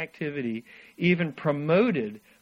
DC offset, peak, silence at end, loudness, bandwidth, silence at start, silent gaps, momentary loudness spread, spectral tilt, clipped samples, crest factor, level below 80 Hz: under 0.1%; -10 dBFS; 0.25 s; -26 LUFS; 6 kHz; 0 s; none; 11 LU; -8.5 dB/octave; under 0.1%; 16 dB; -66 dBFS